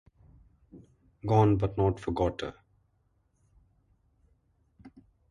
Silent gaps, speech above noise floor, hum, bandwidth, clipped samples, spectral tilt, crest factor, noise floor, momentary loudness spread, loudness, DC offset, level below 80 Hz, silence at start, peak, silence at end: none; 45 dB; none; 9.2 kHz; under 0.1%; -8.5 dB/octave; 22 dB; -71 dBFS; 16 LU; -28 LUFS; under 0.1%; -50 dBFS; 0.75 s; -10 dBFS; 0.45 s